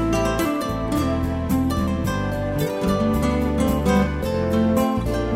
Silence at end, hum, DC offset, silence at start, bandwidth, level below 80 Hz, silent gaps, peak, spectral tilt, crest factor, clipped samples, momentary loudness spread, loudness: 0 s; none; under 0.1%; 0 s; 16 kHz; -30 dBFS; none; -6 dBFS; -6.5 dB/octave; 14 dB; under 0.1%; 4 LU; -22 LUFS